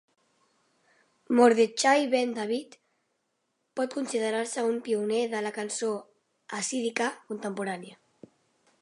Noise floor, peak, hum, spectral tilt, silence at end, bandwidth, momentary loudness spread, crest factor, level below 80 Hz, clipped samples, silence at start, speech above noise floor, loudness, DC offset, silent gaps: -78 dBFS; -8 dBFS; none; -3 dB/octave; 0.9 s; 11.5 kHz; 14 LU; 22 dB; -84 dBFS; under 0.1%; 1.3 s; 50 dB; -28 LUFS; under 0.1%; none